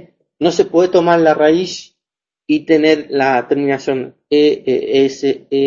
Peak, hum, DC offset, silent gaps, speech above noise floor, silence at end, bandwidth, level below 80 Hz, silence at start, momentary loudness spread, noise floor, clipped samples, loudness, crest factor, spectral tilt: 0 dBFS; none; under 0.1%; none; 72 dB; 0 s; 7.6 kHz; -56 dBFS; 0.4 s; 8 LU; -86 dBFS; under 0.1%; -14 LUFS; 14 dB; -5.5 dB/octave